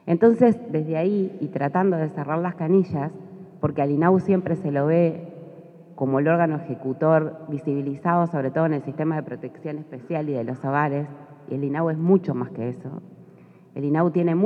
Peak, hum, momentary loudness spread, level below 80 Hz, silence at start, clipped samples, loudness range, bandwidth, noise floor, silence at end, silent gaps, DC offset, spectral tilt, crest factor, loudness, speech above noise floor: -4 dBFS; none; 15 LU; -72 dBFS; 0.05 s; under 0.1%; 4 LU; 4.9 kHz; -49 dBFS; 0 s; none; under 0.1%; -10.5 dB/octave; 18 dB; -23 LUFS; 27 dB